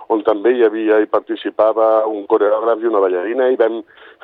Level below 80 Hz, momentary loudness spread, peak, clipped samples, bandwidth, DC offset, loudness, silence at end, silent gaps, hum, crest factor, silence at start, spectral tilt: -68 dBFS; 5 LU; -2 dBFS; under 0.1%; 4.3 kHz; under 0.1%; -16 LUFS; 0.4 s; none; none; 12 dB; 0 s; -7.5 dB/octave